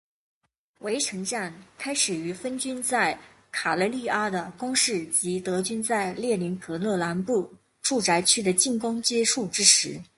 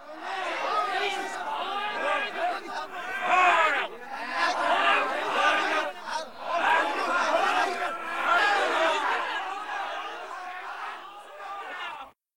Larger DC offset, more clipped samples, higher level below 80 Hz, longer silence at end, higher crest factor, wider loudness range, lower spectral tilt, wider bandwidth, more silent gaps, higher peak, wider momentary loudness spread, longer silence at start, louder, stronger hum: second, under 0.1% vs 0.4%; neither; first, -66 dBFS vs -74 dBFS; first, 0.15 s vs 0 s; first, 26 dB vs 18 dB; about the same, 5 LU vs 5 LU; about the same, -2 dB/octave vs -1 dB/octave; second, 12 kHz vs 18.5 kHz; neither; first, -2 dBFS vs -10 dBFS; second, 11 LU vs 14 LU; first, 0.8 s vs 0 s; about the same, -24 LUFS vs -26 LUFS; neither